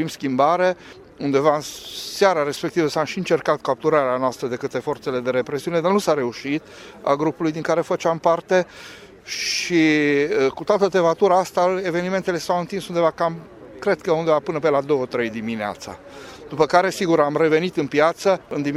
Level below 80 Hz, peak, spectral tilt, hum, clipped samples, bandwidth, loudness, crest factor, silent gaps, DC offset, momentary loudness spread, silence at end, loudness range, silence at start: -60 dBFS; 0 dBFS; -5 dB/octave; none; under 0.1%; 15.5 kHz; -21 LUFS; 20 dB; none; under 0.1%; 11 LU; 0 s; 3 LU; 0 s